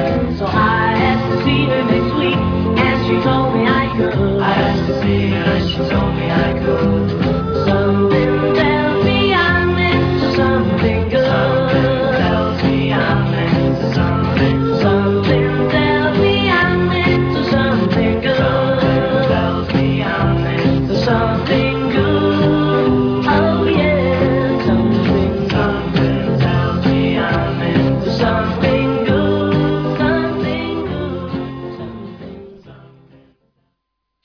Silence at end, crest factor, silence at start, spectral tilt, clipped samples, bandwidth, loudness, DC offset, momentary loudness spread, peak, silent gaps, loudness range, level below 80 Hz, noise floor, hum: 1.5 s; 14 dB; 0 s; -8 dB/octave; under 0.1%; 5.4 kHz; -15 LUFS; under 0.1%; 3 LU; -2 dBFS; none; 2 LU; -32 dBFS; -74 dBFS; none